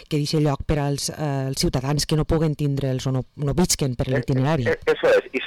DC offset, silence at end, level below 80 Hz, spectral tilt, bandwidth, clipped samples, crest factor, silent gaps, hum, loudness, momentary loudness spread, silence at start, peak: 0.2%; 0 s; -38 dBFS; -5 dB/octave; 19 kHz; under 0.1%; 10 dB; none; none; -22 LUFS; 5 LU; 0 s; -10 dBFS